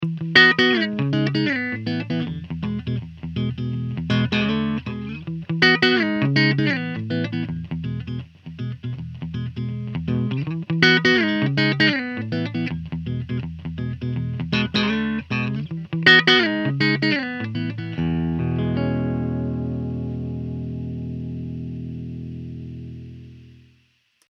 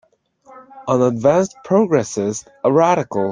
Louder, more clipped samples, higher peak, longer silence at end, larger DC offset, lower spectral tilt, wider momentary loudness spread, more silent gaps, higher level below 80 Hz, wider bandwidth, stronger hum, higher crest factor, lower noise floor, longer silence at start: second, -21 LUFS vs -17 LUFS; neither; about the same, 0 dBFS vs -2 dBFS; first, 0.8 s vs 0 s; neither; about the same, -6 dB/octave vs -6.5 dB/octave; first, 16 LU vs 8 LU; neither; first, -46 dBFS vs -58 dBFS; second, 7.8 kHz vs 10 kHz; first, 60 Hz at -50 dBFS vs none; first, 22 dB vs 16 dB; first, -63 dBFS vs -50 dBFS; second, 0 s vs 0.55 s